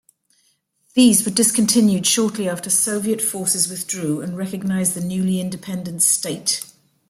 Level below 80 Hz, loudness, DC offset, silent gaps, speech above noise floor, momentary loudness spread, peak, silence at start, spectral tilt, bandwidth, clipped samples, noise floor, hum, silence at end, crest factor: -62 dBFS; -18 LUFS; under 0.1%; none; 45 dB; 10 LU; -2 dBFS; 0.95 s; -3.5 dB/octave; 16 kHz; under 0.1%; -64 dBFS; none; 0.45 s; 18 dB